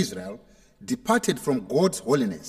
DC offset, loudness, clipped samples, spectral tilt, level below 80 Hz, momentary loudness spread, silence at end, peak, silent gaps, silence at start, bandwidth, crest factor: under 0.1%; -25 LUFS; under 0.1%; -5 dB/octave; -60 dBFS; 17 LU; 0 s; -8 dBFS; none; 0 s; 16 kHz; 18 dB